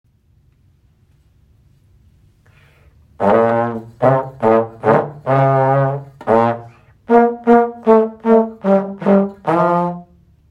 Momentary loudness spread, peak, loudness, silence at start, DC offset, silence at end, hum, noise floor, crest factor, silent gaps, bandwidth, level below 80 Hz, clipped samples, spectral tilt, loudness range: 6 LU; 0 dBFS; -15 LUFS; 3.2 s; under 0.1%; 0.45 s; none; -54 dBFS; 16 dB; none; 6.4 kHz; -54 dBFS; under 0.1%; -9.5 dB/octave; 7 LU